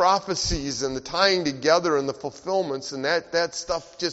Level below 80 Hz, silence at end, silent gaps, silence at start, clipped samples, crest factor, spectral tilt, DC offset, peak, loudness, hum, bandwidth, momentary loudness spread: -44 dBFS; 0 s; none; 0 s; under 0.1%; 20 dB; -2 dB/octave; under 0.1%; -4 dBFS; -24 LUFS; none; 8 kHz; 9 LU